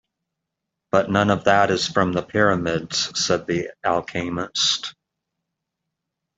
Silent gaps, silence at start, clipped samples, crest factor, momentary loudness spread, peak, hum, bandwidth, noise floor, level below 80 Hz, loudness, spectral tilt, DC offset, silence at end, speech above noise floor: none; 0.95 s; under 0.1%; 20 dB; 8 LU; -2 dBFS; none; 8.2 kHz; -82 dBFS; -56 dBFS; -21 LUFS; -4 dB/octave; under 0.1%; 1.45 s; 61 dB